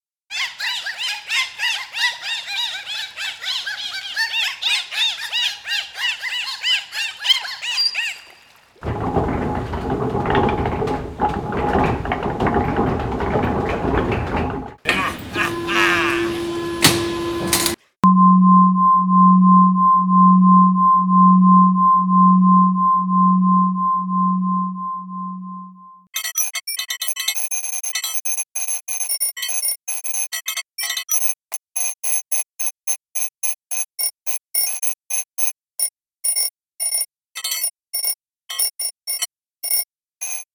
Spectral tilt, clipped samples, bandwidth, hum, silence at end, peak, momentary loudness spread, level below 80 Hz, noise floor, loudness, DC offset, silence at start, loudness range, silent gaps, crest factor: -3.5 dB/octave; under 0.1%; over 20 kHz; none; 0.1 s; 0 dBFS; 12 LU; -40 dBFS; -50 dBFS; -18 LUFS; under 0.1%; 0.3 s; 9 LU; none; 18 dB